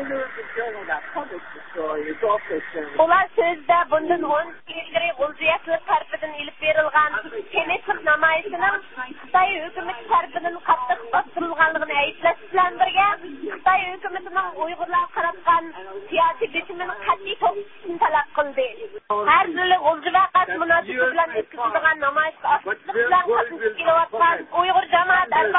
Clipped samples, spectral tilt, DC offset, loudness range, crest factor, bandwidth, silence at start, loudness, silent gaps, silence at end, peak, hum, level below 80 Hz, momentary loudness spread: under 0.1%; -8 dB/octave; 0.6%; 3 LU; 18 dB; 4 kHz; 0 s; -21 LUFS; none; 0 s; -4 dBFS; none; -58 dBFS; 11 LU